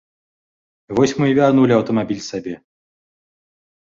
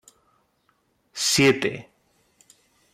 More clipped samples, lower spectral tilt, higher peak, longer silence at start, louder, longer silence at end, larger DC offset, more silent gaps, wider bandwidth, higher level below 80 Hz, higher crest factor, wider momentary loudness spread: neither; first, -6.5 dB/octave vs -3 dB/octave; first, -2 dBFS vs -8 dBFS; second, 0.9 s vs 1.15 s; first, -17 LUFS vs -21 LUFS; first, 1.3 s vs 1.1 s; neither; neither; second, 7.6 kHz vs 15.5 kHz; first, -56 dBFS vs -62 dBFS; about the same, 18 dB vs 20 dB; second, 15 LU vs 22 LU